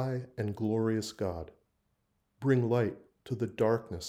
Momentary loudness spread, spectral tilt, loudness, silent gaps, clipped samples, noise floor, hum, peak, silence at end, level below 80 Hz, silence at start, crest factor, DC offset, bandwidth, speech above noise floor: 13 LU; -7 dB/octave; -32 LUFS; none; under 0.1%; -77 dBFS; none; -14 dBFS; 0 s; -64 dBFS; 0 s; 18 dB; under 0.1%; 13.5 kHz; 46 dB